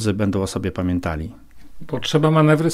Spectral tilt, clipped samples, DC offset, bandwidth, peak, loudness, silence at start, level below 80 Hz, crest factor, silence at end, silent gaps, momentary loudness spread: -6.5 dB/octave; under 0.1%; under 0.1%; 13.5 kHz; -4 dBFS; -20 LUFS; 0 s; -40 dBFS; 16 dB; 0 s; none; 15 LU